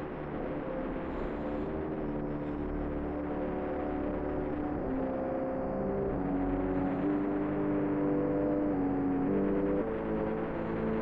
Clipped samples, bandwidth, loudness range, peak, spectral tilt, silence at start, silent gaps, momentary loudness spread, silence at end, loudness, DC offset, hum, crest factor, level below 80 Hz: under 0.1%; 4.3 kHz; 5 LU; -20 dBFS; -11 dB/octave; 0 s; none; 6 LU; 0 s; -33 LUFS; 0.2%; none; 12 dB; -46 dBFS